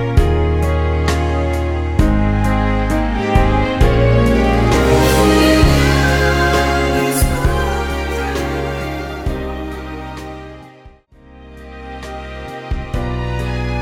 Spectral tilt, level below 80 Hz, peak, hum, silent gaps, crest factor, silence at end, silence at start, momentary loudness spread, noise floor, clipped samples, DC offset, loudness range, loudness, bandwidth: -6 dB/octave; -20 dBFS; 0 dBFS; none; none; 16 dB; 0 s; 0 s; 17 LU; -43 dBFS; under 0.1%; under 0.1%; 15 LU; -16 LUFS; 18 kHz